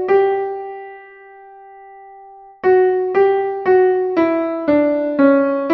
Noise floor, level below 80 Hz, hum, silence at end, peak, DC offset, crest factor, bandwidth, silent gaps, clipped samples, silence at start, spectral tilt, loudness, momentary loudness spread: -41 dBFS; -58 dBFS; none; 0 s; -2 dBFS; under 0.1%; 16 dB; 4.9 kHz; none; under 0.1%; 0 s; -8 dB/octave; -16 LUFS; 12 LU